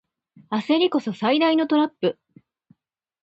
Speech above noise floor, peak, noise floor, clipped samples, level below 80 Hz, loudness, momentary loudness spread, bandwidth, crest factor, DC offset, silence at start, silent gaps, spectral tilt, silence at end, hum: 42 dB; -8 dBFS; -63 dBFS; under 0.1%; -72 dBFS; -22 LUFS; 9 LU; 7.8 kHz; 16 dB; under 0.1%; 0.5 s; none; -6.5 dB/octave; 1.1 s; none